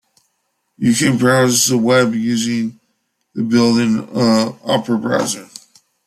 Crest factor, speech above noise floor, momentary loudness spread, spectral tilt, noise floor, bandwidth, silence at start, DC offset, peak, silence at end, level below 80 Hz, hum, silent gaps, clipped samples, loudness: 14 dB; 54 dB; 9 LU; -4.5 dB/octave; -69 dBFS; 15 kHz; 0.8 s; under 0.1%; -2 dBFS; 0.6 s; -56 dBFS; none; none; under 0.1%; -15 LUFS